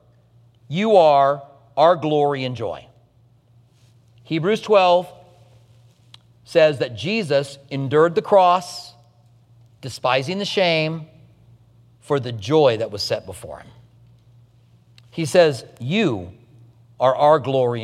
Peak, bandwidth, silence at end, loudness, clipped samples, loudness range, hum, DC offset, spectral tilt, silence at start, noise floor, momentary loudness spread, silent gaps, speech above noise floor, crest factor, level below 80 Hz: -2 dBFS; 13.5 kHz; 0 s; -19 LUFS; under 0.1%; 5 LU; none; under 0.1%; -5.5 dB/octave; 0.7 s; -55 dBFS; 18 LU; none; 37 dB; 20 dB; -62 dBFS